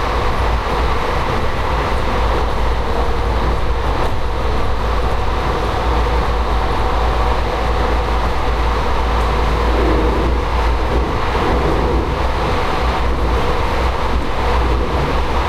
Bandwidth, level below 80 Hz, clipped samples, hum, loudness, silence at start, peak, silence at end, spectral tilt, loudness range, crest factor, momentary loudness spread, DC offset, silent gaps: 12.5 kHz; -18 dBFS; under 0.1%; none; -18 LUFS; 0 s; -4 dBFS; 0 s; -6 dB/octave; 2 LU; 12 dB; 3 LU; under 0.1%; none